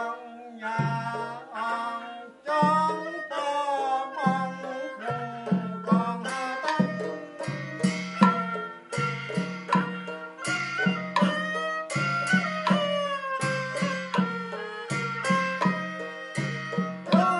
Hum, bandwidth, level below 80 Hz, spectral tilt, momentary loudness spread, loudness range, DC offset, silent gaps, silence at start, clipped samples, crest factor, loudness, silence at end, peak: none; 11.5 kHz; -74 dBFS; -5.5 dB/octave; 10 LU; 2 LU; under 0.1%; none; 0 s; under 0.1%; 24 dB; -28 LUFS; 0 s; -4 dBFS